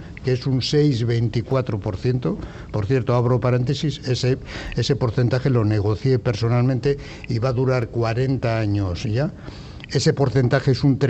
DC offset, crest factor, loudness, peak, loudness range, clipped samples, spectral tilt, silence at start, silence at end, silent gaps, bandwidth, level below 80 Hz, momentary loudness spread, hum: under 0.1%; 14 dB; -21 LUFS; -6 dBFS; 1 LU; under 0.1%; -7 dB/octave; 0 s; 0 s; none; 8.4 kHz; -42 dBFS; 8 LU; none